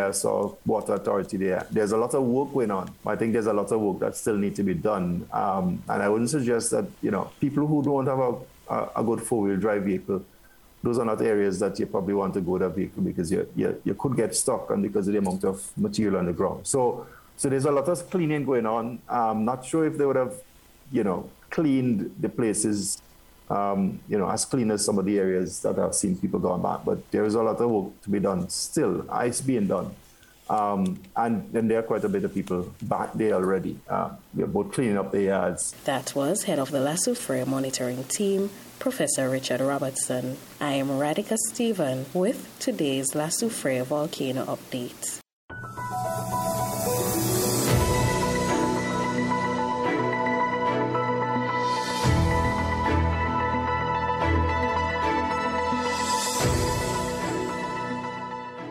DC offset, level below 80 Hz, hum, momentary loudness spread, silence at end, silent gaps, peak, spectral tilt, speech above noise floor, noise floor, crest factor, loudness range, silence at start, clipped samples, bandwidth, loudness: under 0.1%; -46 dBFS; none; 6 LU; 0 s; 45.33-45.48 s; -10 dBFS; -5 dB/octave; 22 dB; -48 dBFS; 16 dB; 3 LU; 0 s; under 0.1%; 18 kHz; -26 LUFS